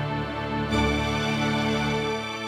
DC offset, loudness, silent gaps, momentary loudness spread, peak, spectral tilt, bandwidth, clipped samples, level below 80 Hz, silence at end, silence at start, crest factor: under 0.1%; -25 LUFS; none; 5 LU; -10 dBFS; -5.5 dB/octave; 16 kHz; under 0.1%; -38 dBFS; 0 s; 0 s; 16 dB